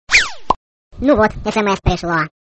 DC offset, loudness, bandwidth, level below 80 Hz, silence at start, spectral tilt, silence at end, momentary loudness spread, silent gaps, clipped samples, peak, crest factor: under 0.1%; -16 LUFS; 8.8 kHz; -30 dBFS; 0.1 s; -4 dB/octave; 0.2 s; 9 LU; 0.56-0.91 s; under 0.1%; 0 dBFS; 16 dB